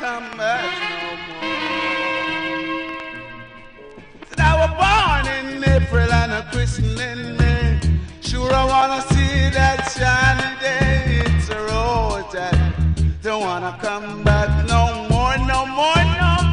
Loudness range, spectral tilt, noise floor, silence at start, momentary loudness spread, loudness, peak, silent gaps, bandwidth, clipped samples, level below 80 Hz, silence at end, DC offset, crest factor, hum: 5 LU; -5.5 dB/octave; -40 dBFS; 0 s; 10 LU; -19 LUFS; -2 dBFS; none; 10.5 kHz; under 0.1%; -24 dBFS; 0 s; under 0.1%; 16 dB; none